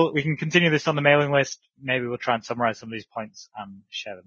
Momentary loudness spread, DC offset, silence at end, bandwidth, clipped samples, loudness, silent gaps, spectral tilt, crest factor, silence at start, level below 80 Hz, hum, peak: 17 LU; under 0.1%; 0.05 s; 7.4 kHz; under 0.1%; -22 LUFS; none; -5 dB/octave; 22 dB; 0 s; -66 dBFS; none; -2 dBFS